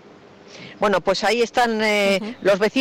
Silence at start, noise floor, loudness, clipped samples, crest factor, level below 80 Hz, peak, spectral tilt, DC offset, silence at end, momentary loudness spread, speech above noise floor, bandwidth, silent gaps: 0.5 s; -46 dBFS; -19 LUFS; under 0.1%; 12 dB; -54 dBFS; -10 dBFS; -4 dB/octave; under 0.1%; 0 s; 5 LU; 27 dB; 16.5 kHz; none